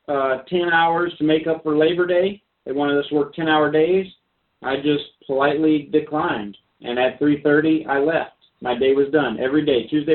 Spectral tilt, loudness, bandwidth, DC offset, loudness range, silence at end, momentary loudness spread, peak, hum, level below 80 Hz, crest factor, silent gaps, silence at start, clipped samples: -10.5 dB/octave; -20 LUFS; 4.3 kHz; under 0.1%; 2 LU; 0 s; 10 LU; -4 dBFS; none; -58 dBFS; 16 dB; none; 0.1 s; under 0.1%